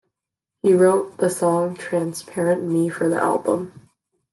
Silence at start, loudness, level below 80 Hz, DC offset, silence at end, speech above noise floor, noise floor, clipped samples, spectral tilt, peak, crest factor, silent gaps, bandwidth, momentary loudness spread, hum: 0.65 s; -20 LUFS; -68 dBFS; under 0.1%; 0.6 s; 65 dB; -85 dBFS; under 0.1%; -6.5 dB/octave; -6 dBFS; 16 dB; none; 12.5 kHz; 9 LU; none